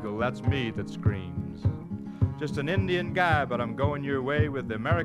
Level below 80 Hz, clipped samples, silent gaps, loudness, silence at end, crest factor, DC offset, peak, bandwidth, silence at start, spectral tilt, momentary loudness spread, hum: -46 dBFS; under 0.1%; none; -29 LUFS; 0 s; 18 dB; under 0.1%; -10 dBFS; 10 kHz; 0 s; -7.5 dB/octave; 7 LU; none